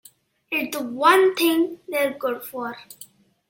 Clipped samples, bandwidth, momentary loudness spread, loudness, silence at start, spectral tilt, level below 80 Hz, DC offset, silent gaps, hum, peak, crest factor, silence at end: under 0.1%; 17 kHz; 16 LU; -21 LUFS; 0.5 s; -2.5 dB/octave; -72 dBFS; under 0.1%; none; none; -2 dBFS; 20 dB; 0.45 s